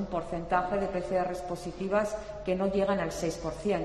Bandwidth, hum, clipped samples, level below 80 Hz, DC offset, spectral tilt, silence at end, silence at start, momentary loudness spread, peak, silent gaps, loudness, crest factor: 13 kHz; none; under 0.1%; -48 dBFS; under 0.1%; -6 dB/octave; 0 s; 0 s; 7 LU; -12 dBFS; none; -31 LUFS; 18 dB